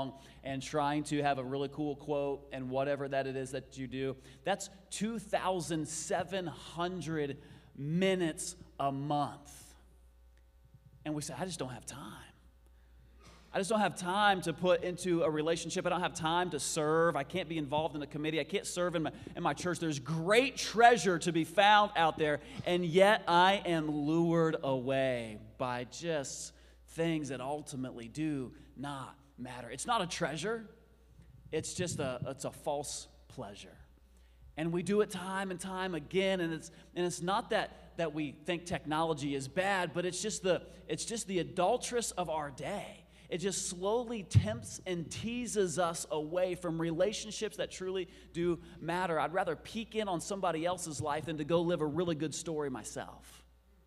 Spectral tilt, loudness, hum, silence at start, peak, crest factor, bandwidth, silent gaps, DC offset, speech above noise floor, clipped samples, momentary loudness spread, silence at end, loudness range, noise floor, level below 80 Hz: -4.5 dB/octave; -34 LUFS; none; 0 s; -10 dBFS; 26 dB; 15.5 kHz; none; under 0.1%; 28 dB; under 0.1%; 13 LU; 0.45 s; 11 LU; -62 dBFS; -60 dBFS